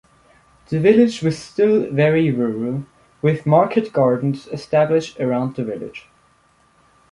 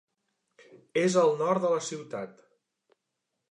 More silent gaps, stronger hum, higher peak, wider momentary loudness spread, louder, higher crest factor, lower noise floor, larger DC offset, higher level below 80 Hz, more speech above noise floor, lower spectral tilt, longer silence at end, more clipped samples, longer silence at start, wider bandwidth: neither; neither; first, -2 dBFS vs -10 dBFS; second, 12 LU vs 15 LU; first, -18 LUFS vs -27 LUFS; about the same, 18 dB vs 20 dB; second, -57 dBFS vs -83 dBFS; neither; first, -56 dBFS vs -82 dBFS; second, 40 dB vs 56 dB; first, -7.5 dB/octave vs -5 dB/octave; about the same, 1.1 s vs 1.2 s; neither; second, 0.7 s vs 0.95 s; about the same, 11 kHz vs 11 kHz